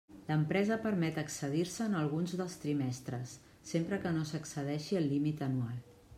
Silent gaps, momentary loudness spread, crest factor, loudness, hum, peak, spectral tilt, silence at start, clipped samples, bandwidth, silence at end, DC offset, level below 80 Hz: none; 9 LU; 18 dB; -35 LUFS; none; -18 dBFS; -6 dB/octave; 0.1 s; under 0.1%; 15.5 kHz; 0 s; under 0.1%; -68 dBFS